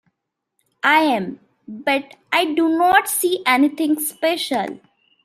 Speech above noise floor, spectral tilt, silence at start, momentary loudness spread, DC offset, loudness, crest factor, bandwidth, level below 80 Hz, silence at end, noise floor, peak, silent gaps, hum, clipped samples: 60 dB; -2.5 dB/octave; 0.85 s; 9 LU; under 0.1%; -18 LUFS; 18 dB; 16 kHz; -66 dBFS; 0.5 s; -78 dBFS; -2 dBFS; none; none; under 0.1%